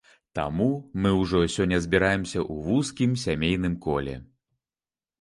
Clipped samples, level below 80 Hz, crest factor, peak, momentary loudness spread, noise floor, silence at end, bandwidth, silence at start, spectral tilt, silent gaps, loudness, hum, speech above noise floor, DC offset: under 0.1%; -44 dBFS; 20 dB; -6 dBFS; 8 LU; under -90 dBFS; 1 s; 11.5 kHz; 0.35 s; -6 dB/octave; none; -25 LUFS; none; over 65 dB; under 0.1%